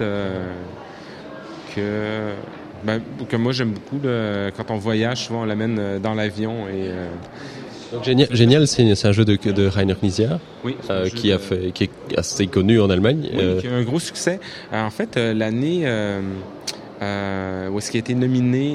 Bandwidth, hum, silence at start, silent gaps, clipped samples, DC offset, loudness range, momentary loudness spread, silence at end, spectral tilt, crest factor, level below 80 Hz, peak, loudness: 13 kHz; none; 0 s; none; under 0.1%; under 0.1%; 7 LU; 15 LU; 0 s; -6 dB/octave; 20 dB; -50 dBFS; 0 dBFS; -21 LUFS